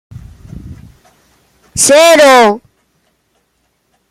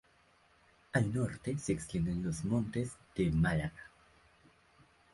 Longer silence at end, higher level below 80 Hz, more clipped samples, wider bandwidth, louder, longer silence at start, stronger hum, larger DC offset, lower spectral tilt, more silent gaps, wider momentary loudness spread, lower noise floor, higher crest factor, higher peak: first, 1.5 s vs 1.25 s; first, -44 dBFS vs -52 dBFS; neither; first, 16.5 kHz vs 11.5 kHz; first, -6 LUFS vs -35 LUFS; second, 0.15 s vs 0.95 s; neither; neither; second, -2 dB/octave vs -6.5 dB/octave; neither; first, 25 LU vs 9 LU; second, -61 dBFS vs -68 dBFS; second, 12 dB vs 20 dB; first, 0 dBFS vs -16 dBFS